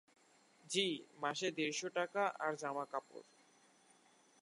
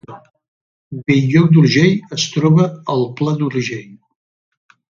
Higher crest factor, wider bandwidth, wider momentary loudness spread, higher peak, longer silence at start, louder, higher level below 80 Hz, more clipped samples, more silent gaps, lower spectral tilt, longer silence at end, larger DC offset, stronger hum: first, 22 dB vs 16 dB; first, 11.5 kHz vs 7.4 kHz; second, 9 LU vs 14 LU; second, -20 dBFS vs 0 dBFS; first, 0.65 s vs 0.1 s; second, -40 LUFS vs -15 LUFS; second, under -90 dBFS vs -56 dBFS; neither; second, none vs 0.48-0.91 s; second, -2.5 dB/octave vs -6.5 dB/octave; first, 1.2 s vs 1.05 s; neither; neither